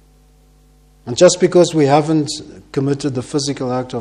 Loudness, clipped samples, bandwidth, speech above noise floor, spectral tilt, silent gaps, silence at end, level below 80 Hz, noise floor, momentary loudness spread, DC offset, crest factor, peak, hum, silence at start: -15 LUFS; under 0.1%; 11.5 kHz; 34 dB; -5 dB/octave; none; 0 s; -50 dBFS; -49 dBFS; 13 LU; under 0.1%; 16 dB; 0 dBFS; 50 Hz at -45 dBFS; 1.05 s